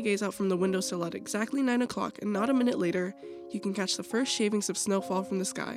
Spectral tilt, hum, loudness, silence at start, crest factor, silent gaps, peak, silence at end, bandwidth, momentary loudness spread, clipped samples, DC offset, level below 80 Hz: -4 dB/octave; none; -30 LUFS; 0 s; 14 dB; none; -16 dBFS; 0 s; 15 kHz; 7 LU; under 0.1%; under 0.1%; -72 dBFS